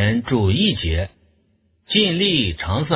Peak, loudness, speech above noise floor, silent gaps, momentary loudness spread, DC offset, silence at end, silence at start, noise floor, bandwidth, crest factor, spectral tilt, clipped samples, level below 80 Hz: -2 dBFS; -19 LUFS; 43 dB; none; 7 LU; under 0.1%; 0 s; 0 s; -62 dBFS; 4 kHz; 18 dB; -10 dB/octave; under 0.1%; -32 dBFS